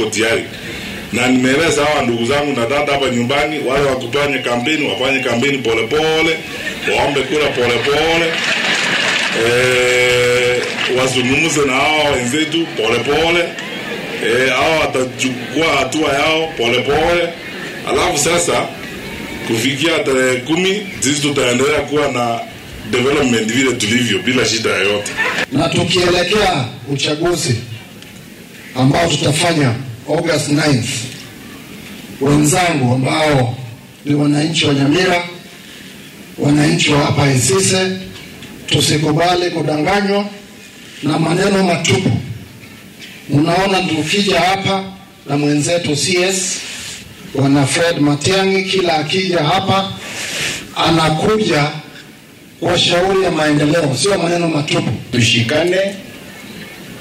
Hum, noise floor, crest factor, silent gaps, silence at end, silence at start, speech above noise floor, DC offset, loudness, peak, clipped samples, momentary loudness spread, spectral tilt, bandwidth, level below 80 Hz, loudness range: none; -39 dBFS; 16 dB; none; 0 s; 0 s; 25 dB; under 0.1%; -14 LUFS; 0 dBFS; under 0.1%; 15 LU; -4 dB/octave; 16 kHz; -42 dBFS; 3 LU